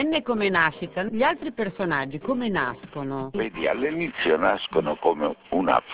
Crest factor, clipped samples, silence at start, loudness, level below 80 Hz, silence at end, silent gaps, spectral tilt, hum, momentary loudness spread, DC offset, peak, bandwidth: 20 dB; under 0.1%; 0 s; -25 LUFS; -56 dBFS; 0 s; none; -9 dB/octave; none; 8 LU; under 0.1%; -4 dBFS; 4 kHz